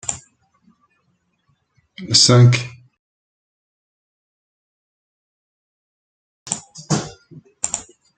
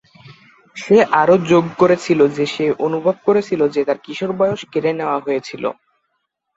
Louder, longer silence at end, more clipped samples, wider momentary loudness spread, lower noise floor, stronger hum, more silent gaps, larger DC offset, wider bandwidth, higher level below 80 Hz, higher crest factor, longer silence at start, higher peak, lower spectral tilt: about the same, -16 LUFS vs -17 LUFS; second, 0.35 s vs 0.85 s; neither; first, 24 LU vs 11 LU; second, -67 dBFS vs -72 dBFS; neither; first, 2.99-6.46 s vs none; neither; first, 9.4 kHz vs 8 kHz; about the same, -58 dBFS vs -60 dBFS; first, 22 dB vs 16 dB; second, 0.1 s vs 0.25 s; about the same, 0 dBFS vs -2 dBFS; second, -4 dB/octave vs -6.5 dB/octave